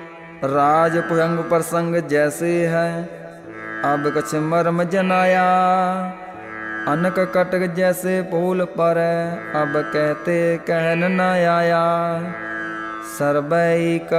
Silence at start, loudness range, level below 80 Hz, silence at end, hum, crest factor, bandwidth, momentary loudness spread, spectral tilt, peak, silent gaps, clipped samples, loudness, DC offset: 0 s; 2 LU; -60 dBFS; 0 s; none; 14 dB; 15.5 kHz; 11 LU; -6 dB/octave; -6 dBFS; none; under 0.1%; -19 LUFS; under 0.1%